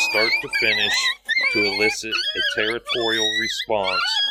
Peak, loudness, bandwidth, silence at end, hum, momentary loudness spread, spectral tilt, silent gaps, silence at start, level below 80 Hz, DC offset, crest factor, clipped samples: -6 dBFS; -19 LUFS; 16 kHz; 0 s; none; 5 LU; -1.5 dB/octave; none; 0 s; -56 dBFS; under 0.1%; 16 dB; under 0.1%